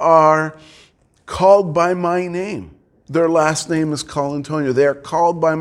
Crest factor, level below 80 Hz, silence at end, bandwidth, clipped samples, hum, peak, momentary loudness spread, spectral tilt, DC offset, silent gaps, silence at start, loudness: 16 dB; -50 dBFS; 0 s; 12.5 kHz; under 0.1%; none; 0 dBFS; 12 LU; -5.5 dB/octave; under 0.1%; none; 0 s; -17 LUFS